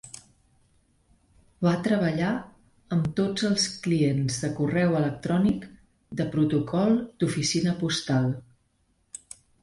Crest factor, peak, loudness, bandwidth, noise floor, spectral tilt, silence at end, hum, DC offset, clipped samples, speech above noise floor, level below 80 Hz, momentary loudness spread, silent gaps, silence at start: 16 dB; -12 dBFS; -26 LUFS; 11.5 kHz; -69 dBFS; -5.5 dB/octave; 1.2 s; none; under 0.1%; under 0.1%; 44 dB; -56 dBFS; 14 LU; none; 0.05 s